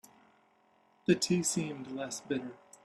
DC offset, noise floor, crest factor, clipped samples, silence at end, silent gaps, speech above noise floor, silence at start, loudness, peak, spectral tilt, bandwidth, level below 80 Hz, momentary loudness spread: under 0.1%; -68 dBFS; 22 dB; under 0.1%; 0.3 s; none; 36 dB; 1.1 s; -33 LUFS; -14 dBFS; -4 dB/octave; 13 kHz; -74 dBFS; 11 LU